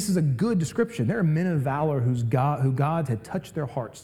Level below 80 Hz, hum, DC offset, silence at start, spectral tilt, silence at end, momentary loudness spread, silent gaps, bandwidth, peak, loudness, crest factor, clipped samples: -58 dBFS; none; 0.1%; 0 s; -7.5 dB/octave; 0 s; 7 LU; none; 14.5 kHz; -10 dBFS; -25 LUFS; 14 dB; under 0.1%